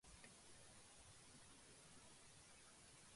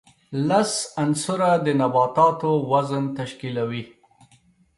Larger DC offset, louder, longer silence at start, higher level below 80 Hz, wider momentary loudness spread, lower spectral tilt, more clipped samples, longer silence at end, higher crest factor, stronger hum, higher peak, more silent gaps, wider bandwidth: neither; second, -64 LUFS vs -22 LUFS; second, 0.05 s vs 0.3 s; second, -78 dBFS vs -64 dBFS; second, 1 LU vs 10 LU; second, -2 dB/octave vs -5.5 dB/octave; neither; second, 0 s vs 0.9 s; about the same, 18 dB vs 18 dB; neither; second, -48 dBFS vs -4 dBFS; neither; about the same, 11.5 kHz vs 11.5 kHz